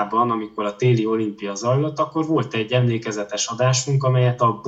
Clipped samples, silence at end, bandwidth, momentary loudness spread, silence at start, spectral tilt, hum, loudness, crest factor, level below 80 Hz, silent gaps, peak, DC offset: under 0.1%; 0 s; 8 kHz; 7 LU; 0 s; -5.5 dB/octave; none; -21 LUFS; 14 dB; -66 dBFS; none; -6 dBFS; under 0.1%